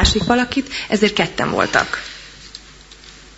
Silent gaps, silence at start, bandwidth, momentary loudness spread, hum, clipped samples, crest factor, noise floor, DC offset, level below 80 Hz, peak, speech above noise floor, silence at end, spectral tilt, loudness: none; 0 s; 8 kHz; 21 LU; none; under 0.1%; 20 dB; -42 dBFS; under 0.1%; -32 dBFS; 0 dBFS; 24 dB; 0.15 s; -4 dB/octave; -18 LUFS